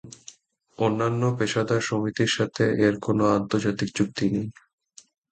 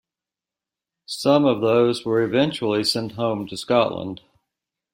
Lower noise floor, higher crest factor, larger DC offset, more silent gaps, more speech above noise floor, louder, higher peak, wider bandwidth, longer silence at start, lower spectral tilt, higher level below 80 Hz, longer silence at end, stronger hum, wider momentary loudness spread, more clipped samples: second, -52 dBFS vs -89 dBFS; about the same, 18 dB vs 20 dB; neither; neither; second, 29 dB vs 69 dB; second, -24 LUFS vs -21 LUFS; second, -8 dBFS vs -4 dBFS; second, 9.2 kHz vs 16.5 kHz; second, 0.05 s vs 1.1 s; about the same, -5.5 dB/octave vs -5.5 dB/octave; about the same, -58 dBFS vs -62 dBFS; about the same, 0.8 s vs 0.75 s; neither; second, 5 LU vs 13 LU; neither